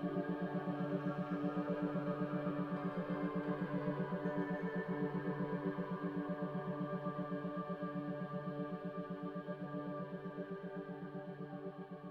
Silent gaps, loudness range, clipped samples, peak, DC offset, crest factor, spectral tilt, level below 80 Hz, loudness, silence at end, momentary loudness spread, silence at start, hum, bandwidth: none; 5 LU; under 0.1%; -26 dBFS; under 0.1%; 16 dB; -9.5 dB/octave; -72 dBFS; -42 LUFS; 0 s; 7 LU; 0 s; none; 5.4 kHz